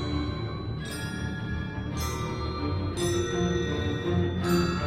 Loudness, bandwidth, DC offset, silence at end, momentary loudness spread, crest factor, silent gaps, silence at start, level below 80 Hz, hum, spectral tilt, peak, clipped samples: -30 LUFS; 16 kHz; under 0.1%; 0 s; 7 LU; 16 dB; none; 0 s; -40 dBFS; none; -5.5 dB/octave; -12 dBFS; under 0.1%